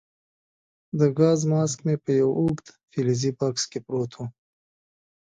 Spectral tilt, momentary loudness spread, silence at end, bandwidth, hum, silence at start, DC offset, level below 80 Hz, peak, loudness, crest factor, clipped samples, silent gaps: -6 dB/octave; 14 LU; 0.95 s; 9.4 kHz; none; 0.95 s; under 0.1%; -60 dBFS; -8 dBFS; -24 LUFS; 18 dB; under 0.1%; none